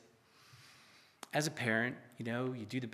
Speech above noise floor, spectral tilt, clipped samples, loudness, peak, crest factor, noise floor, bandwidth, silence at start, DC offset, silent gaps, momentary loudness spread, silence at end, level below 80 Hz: 28 dB; -4.5 dB/octave; under 0.1%; -37 LUFS; -18 dBFS; 22 dB; -65 dBFS; 14.5 kHz; 0.5 s; under 0.1%; none; 24 LU; 0 s; -86 dBFS